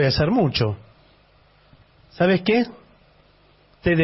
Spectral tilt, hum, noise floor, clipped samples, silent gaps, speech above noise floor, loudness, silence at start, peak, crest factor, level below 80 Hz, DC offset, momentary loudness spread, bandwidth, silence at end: -9.5 dB/octave; 50 Hz at -55 dBFS; -56 dBFS; under 0.1%; none; 36 dB; -21 LUFS; 0 s; -6 dBFS; 16 dB; -44 dBFS; under 0.1%; 9 LU; 6 kHz; 0 s